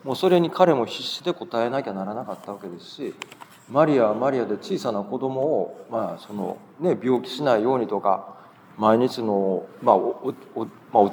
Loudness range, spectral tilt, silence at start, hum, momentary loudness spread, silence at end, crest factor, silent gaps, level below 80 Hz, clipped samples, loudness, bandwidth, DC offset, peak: 3 LU; -6.5 dB/octave; 0.05 s; none; 15 LU; 0 s; 22 dB; none; -80 dBFS; under 0.1%; -23 LUFS; over 20 kHz; under 0.1%; -2 dBFS